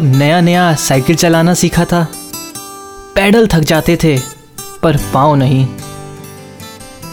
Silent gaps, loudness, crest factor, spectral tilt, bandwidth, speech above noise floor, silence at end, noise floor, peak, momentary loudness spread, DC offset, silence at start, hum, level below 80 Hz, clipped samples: none; -11 LUFS; 12 dB; -5.5 dB/octave; 19 kHz; 21 dB; 0 s; -31 dBFS; 0 dBFS; 21 LU; under 0.1%; 0 s; none; -34 dBFS; under 0.1%